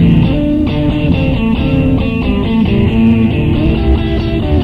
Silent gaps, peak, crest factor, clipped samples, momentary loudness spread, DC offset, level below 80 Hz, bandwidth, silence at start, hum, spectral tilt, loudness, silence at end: none; 0 dBFS; 10 dB; under 0.1%; 4 LU; 0.3%; -18 dBFS; 5.8 kHz; 0 s; none; -9.5 dB/octave; -12 LUFS; 0 s